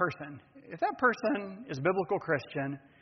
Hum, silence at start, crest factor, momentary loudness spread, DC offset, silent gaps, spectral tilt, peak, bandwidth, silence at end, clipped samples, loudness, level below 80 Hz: none; 0 s; 20 dB; 16 LU; under 0.1%; none; -5 dB/octave; -14 dBFS; 6.4 kHz; 0.25 s; under 0.1%; -32 LUFS; -72 dBFS